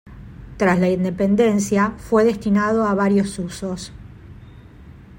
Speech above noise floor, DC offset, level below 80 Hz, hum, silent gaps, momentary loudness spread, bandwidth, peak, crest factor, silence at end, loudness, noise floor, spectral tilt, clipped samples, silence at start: 24 dB; under 0.1%; -44 dBFS; none; none; 13 LU; 16.5 kHz; -4 dBFS; 16 dB; 0 s; -19 LUFS; -42 dBFS; -6.5 dB/octave; under 0.1%; 0.05 s